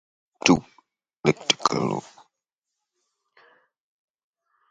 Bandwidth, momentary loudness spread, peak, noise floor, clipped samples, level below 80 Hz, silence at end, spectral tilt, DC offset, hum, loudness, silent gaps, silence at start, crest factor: 9.4 kHz; 7 LU; 0 dBFS; -85 dBFS; under 0.1%; -60 dBFS; 2.7 s; -4 dB/octave; under 0.1%; none; -23 LUFS; none; 0.45 s; 28 dB